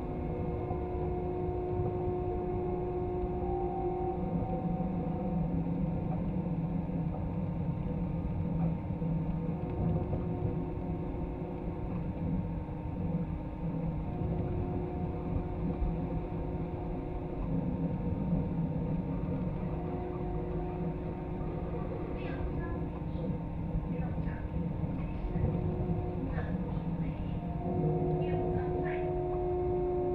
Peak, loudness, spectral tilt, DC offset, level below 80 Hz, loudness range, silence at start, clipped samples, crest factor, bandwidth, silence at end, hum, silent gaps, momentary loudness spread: -18 dBFS; -35 LUFS; -11.5 dB/octave; under 0.1%; -42 dBFS; 3 LU; 0 s; under 0.1%; 16 dB; 4.3 kHz; 0 s; none; none; 5 LU